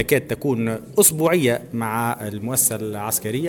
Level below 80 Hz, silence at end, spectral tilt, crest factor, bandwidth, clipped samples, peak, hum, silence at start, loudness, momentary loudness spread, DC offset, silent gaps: -54 dBFS; 0 s; -4 dB/octave; 18 dB; 19.5 kHz; under 0.1%; -4 dBFS; none; 0 s; -20 LUFS; 9 LU; under 0.1%; none